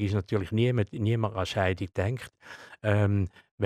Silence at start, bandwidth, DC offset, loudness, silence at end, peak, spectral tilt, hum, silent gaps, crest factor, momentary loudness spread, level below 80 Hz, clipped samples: 0 s; 10.5 kHz; under 0.1%; -29 LUFS; 0 s; -10 dBFS; -7.5 dB/octave; none; 3.51-3.58 s; 18 dB; 12 LU; -54 dBFS; under 0.1%